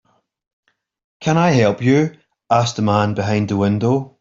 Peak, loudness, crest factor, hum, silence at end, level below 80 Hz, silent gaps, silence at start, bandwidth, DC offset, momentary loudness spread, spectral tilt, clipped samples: -2 dBFS; -17 LUFS; 16 dB; none; 0.15 s; -54 dBFS; none; 1.2 s; 7.8 kHz; under 0.1%; 5 LU; -6.5 dB/octave; under 0.1%